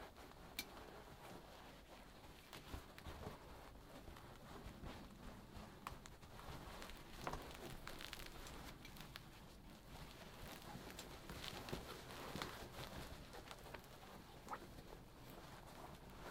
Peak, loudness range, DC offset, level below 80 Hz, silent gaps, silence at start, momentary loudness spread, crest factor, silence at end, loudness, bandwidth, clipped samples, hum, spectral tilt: -26 dBFS; 5 LU; under 0.1%; -62 dBFS; none; 0 s; 9 LU; 28 dB; 0 s; -55 LUFS; 17 kHz; under 0.1%; none; -4 dB/octave